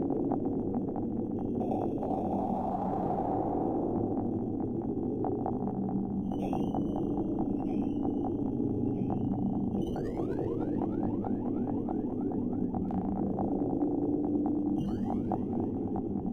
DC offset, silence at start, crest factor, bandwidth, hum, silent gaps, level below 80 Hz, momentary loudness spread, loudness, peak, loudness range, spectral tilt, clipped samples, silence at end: under 0.1%; 0 s; 16 dB; 6.4 kHz; none; none; -50 dBFS; 3 LU; -32 LUFS; -16 dBFS; 1 LU; -11 dB/octave; under 0.1%; 0 s